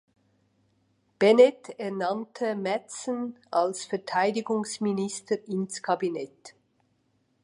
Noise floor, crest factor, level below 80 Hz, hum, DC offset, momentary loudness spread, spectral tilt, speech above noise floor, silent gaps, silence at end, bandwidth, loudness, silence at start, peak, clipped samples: -71 dBFS; 22 dB; -78 dBFS; none; under 0.1%; 13 LU; -4.5 dB/octave; 44 dB; none; 0.95 s; 11.5 kHz; -27 LUFS; 1.2 s; -6 dBFS; under 0.1%